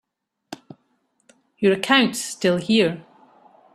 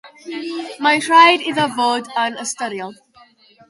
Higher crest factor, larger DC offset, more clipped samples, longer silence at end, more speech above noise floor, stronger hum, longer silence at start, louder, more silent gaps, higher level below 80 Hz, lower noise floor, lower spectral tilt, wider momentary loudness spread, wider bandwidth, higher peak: about the same, 22 dB vs 18 dB; neither; neither; about the same, 0.75 s vs 0.75 s; first, 48 dB vs 33 dB; neither; first, 0.5 s vs 0.05 s; second, -20 LUFS vs -16 LUFS; neither; about the same, -64 dBFS vs -68 dBFS; first, -68 dBFS vs -50 dBFS; first, -4 dB/octave vs -2.5 dB/octave; first, 23 LU vs 19 LU; first, 13.5 kHz vs 11.5 kHz; about the same, -2 dBFS vs 0 dBFS